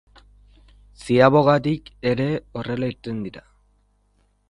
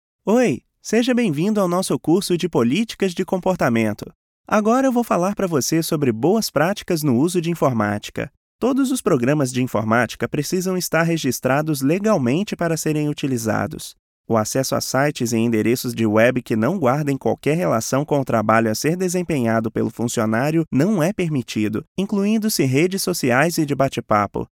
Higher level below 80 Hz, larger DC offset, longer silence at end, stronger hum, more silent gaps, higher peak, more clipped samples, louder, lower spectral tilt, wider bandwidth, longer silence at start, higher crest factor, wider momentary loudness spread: about the same, -50 dBFS vs -54 dBFS; neither; first, 1.1 s vs 0.1 s; first, 50 Hz at -50 dBFS vs none; second, none vs 4.15-4.44 s, 8.37-8.59 s, 13.99-14.24 s, 21.88-21.95 s; about the same, 0 dBFS vs -2 dBFS; neither; about the same, -21 LUFS vs -20 LUFS; first, -7.5 dB/octave vs -5.5 dB/octave; second, 11.5 kHz vs 18.5 kHz; first, 1 s vs 0.25 s; first, 22 dB vs 16 dB; first, 16 LU vs 5 LU